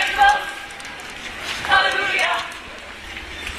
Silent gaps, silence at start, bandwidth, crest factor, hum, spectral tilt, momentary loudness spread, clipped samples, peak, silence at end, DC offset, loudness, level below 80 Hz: none; 0 s; 14 kHz; 20 dB; none; -1 dB/octave; 17 LU; under 0.1%; -2 dBFS; 0 s; under 0.1%; -19 LUFS; -44 dBFS